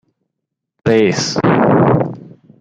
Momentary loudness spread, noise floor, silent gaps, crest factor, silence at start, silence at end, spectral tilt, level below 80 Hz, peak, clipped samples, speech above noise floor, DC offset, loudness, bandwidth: 11 LU; -78 dBFS; none; 14 dB; 0.85 s; 0.3 s; -6 dB/octave; -48 dBFS; 0 dBFS; under 0.1%; 66 dB; under 0.1%; -14 LUFS; 9.2 kHz